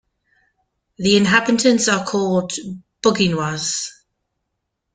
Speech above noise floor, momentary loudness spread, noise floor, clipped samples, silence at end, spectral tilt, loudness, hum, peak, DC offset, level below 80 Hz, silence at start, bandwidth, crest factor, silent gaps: 59 dB; 13 LU; -77 dBFS; under 0.1%; 1.05 s; -4 dB/octave; -18 LUFS; none; -2 dBFS; under 0.1%; -56 dBFS; 1 s; 9.6 kHz; 18 dB; none